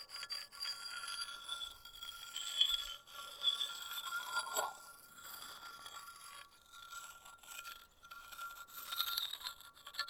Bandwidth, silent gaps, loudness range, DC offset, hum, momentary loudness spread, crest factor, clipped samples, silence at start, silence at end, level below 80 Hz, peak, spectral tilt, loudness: 19.5 kHz; none; 13 LU; under 0.1%; none; 18 LU; 28 dB; under 0.1%; 0 s; 0 s; -74 dBFS; -16 dBFS; 2 dB/octave; -41 LUFS